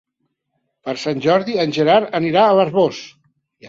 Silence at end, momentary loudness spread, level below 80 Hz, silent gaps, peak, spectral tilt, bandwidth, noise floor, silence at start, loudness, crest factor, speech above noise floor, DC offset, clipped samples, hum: 0 s; 13 LU; -62 dBFS; none; 0 dBFS; -6 dB/octave; 7.8 kHz; -72 dBFS; 0.85 s; -16 LUFS; 18 dB; 57 dB; under 0.1%; under 0.1%; none